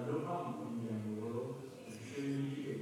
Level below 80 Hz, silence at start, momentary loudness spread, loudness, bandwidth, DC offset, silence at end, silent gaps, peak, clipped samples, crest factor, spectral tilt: -82 dBFS; 0 s; 9 LU; -42 LUFS; 17 kHz; under 0.1%; 0 s; none; -28 dBFS; under 0.1%; 14 dB; -7 dB/octave